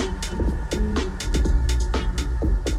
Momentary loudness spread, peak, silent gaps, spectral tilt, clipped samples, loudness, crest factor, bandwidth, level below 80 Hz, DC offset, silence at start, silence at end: 4 LU; -10 dBFS; none; -5.5 dB/octave; under 0.1%; -25 LUFS; 12 dB; 13 kHz; -24 dBFS; under 0.1%; 0 s; 0 s